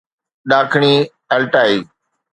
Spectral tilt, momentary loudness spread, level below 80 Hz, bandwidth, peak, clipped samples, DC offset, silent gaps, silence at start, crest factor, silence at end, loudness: -6 dB/octave; 7 LU; -62 dBFS; 9.2 kHz; 0 dBFS; under 0.1%; under 0.1%; none; 0.45 s; 16 dB; 0.5 s; -14 LUFS